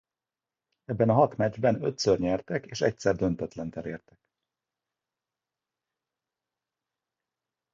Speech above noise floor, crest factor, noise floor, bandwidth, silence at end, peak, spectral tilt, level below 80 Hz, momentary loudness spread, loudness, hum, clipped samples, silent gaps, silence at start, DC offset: over 63 dB; 22 dB; under -90 dBFS; 7.8 kHz; 3.75 s; -8 dBFS; -6 dB/octave; -58 dBFS; 14 LU; -27 LUFS; none; under 0.1%; none; 0.9 s; under 0.1%